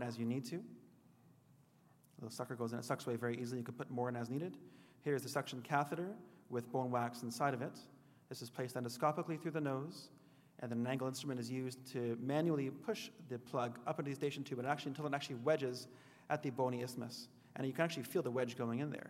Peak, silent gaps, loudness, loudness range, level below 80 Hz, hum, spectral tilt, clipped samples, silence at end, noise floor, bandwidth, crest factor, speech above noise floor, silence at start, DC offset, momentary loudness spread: -18 dBFS; none; -41 LUFS; 3 LU; under -90 dBFS; none; -6 dB/octave; under 0.1%; 0 s; -69 dBFS; 16 kHz; 22 dB; 28 dB; 0 s; under 0.1%; 12 LU